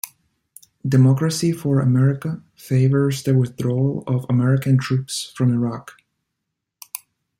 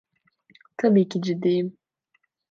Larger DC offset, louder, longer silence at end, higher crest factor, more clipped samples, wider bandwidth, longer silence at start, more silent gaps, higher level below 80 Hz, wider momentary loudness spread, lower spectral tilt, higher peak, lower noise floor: neither; first, -19 LUFS vs -23 LUFS; second, 0.4 s vs 0.8 s; about the same, 14 dB vs 16 dB; neither; first, 16 kHz vs 7.4 kHz; second, 0.05 s vs 0.8 s; neither; first, -60 dBFS vs -76 dBFS; first, 17 LU vs 12 LU; about the same, -7 dB/octave vs -8 dB/octave; about the same, -6 dBFS vs -8 dBFS; first, -79 dBFS vs -71 dBFS